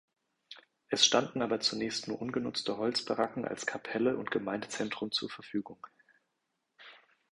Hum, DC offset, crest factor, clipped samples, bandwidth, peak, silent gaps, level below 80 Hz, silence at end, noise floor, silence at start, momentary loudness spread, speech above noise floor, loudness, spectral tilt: none; under 0.1%; 24 dB; under 0.1%; 11.5 kHz; -10 dBFS; none; -72 dBFS; 0.35 s; -83 dBFS; 0.5 s; 18 LU; 50 dB; -32 LUFS; -2.5 dB/octave